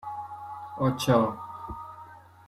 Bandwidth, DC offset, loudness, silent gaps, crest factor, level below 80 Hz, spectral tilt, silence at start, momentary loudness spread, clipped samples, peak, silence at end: 14.5 kHz; under 0.1%; -28 LUFS; none; 22 dB; -56 dBFS; -6.5 dB/octave; 0 s; 20 LU; under 0.1%; -8 dBFS; 0 s